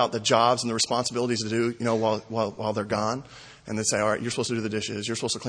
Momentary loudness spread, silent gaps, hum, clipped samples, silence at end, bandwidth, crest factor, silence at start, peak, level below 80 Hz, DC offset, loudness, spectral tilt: 8 LU; none; none; under 0.1%; 0 s; 10.5 kHz; 22 dB; 0 s; -6 dBFS; -62 dBFS; under 0.1%; -26 LUFS; -3.5 dB/octave